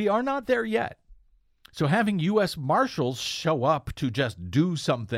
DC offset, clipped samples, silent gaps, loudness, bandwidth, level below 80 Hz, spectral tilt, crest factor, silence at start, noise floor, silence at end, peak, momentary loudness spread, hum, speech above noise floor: under 0.1%; under 0.1%; none; -26 LUFS; 15.5 kHz; -54 dBFS; -6 dB/octave; 16 dB; 0 s; -60 dBFS; 0 s; -10 dBFS; 5 LU; none; 35 dB